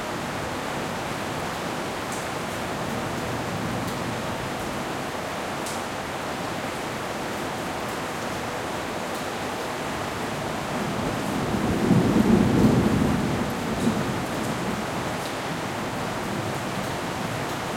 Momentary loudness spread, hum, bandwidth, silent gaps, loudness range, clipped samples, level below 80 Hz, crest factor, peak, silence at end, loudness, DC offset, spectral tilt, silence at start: 9 LU; none; 16.5 kHz; none; 7 LU; under 0.1%; -46 dBFS; 20 dB; -6 dBFS; 0 s; -27 LUFS; under 0.1%; -5 dB/octave; 0 s